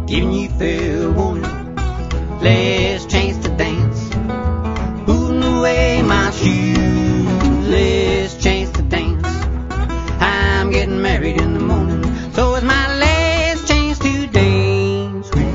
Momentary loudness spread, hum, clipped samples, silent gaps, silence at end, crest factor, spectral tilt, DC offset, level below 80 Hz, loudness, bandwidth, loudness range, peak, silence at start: 7 LU; none; under 0.1%; none; 0 s; 16 dB; -6 dB/octave; under 0.1%; -22 dBFS; -16 LUFS; 7.8 kHz; 3 LU; 0 dBFS; 0 s